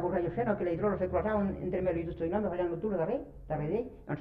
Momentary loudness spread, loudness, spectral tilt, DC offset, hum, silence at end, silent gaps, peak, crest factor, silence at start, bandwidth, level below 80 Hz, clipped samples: 6 LU; -33 LUFS; -10.5 dB/octave; under 0.1%; none; 0 s; none; -16 dBFS; 16 dB; 0 s; 4.9 kHz; -50 dBFS; under 0.1%